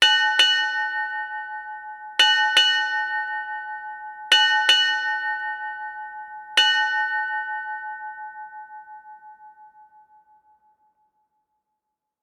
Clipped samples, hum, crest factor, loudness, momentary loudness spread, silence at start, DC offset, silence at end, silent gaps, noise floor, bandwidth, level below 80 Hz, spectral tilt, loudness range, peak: under 0.1%; none; 20 dB; -20 LUFS; 20 LU; 0 s; under 0.1%; 2.55 s; none; -82 dBFS; 18 kHz; -78 dBFS; 3.5 dB/octave; 14 LU; -4 dBFS